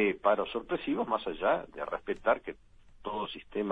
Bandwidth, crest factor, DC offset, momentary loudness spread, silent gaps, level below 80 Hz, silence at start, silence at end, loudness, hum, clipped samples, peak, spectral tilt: 4.9 kHz; 20 dB; under 0.1%; 10 LU; none; -58 dBFS; 0 s; 0 s; -32 LUFS; none; under 0.1%; -12 dBFS; -7 dB/octave